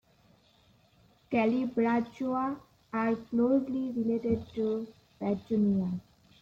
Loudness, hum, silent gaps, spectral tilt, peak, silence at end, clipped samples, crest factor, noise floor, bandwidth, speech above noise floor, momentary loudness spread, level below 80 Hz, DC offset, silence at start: -31 LUFS; none; none; -9 dB/octave; -16 dBFS; 0.4 s; under 0.1%; 14 dB; -64 dBFS; 7 kHz; 35 dB; 9 LU; -64 dBFS; under 0.1%; 1.3 s